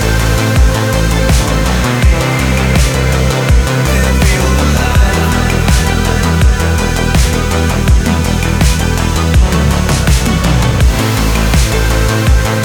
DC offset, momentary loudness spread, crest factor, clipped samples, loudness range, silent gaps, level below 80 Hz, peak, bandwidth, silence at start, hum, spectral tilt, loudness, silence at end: under 0.1%; 2 LU; 10 dB; under 0.1%; 1 LU; none; -14 dBFS; 0 dBFS; 20 kHz; 0 s; none; -5 dB/octave; -11 LUFS; 0 s